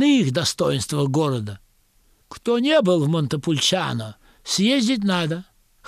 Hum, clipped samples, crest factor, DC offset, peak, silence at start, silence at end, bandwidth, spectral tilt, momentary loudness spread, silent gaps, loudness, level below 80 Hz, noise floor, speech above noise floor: none; under 0.1%; 14 dB; under 0.1%; -6 dBFS; 0 s; 0.45 s; 15 kHz; -5 dB/octave; 13 LU; none; -21 LUFS; -56 dBFS; -59 dBFS; 39 dB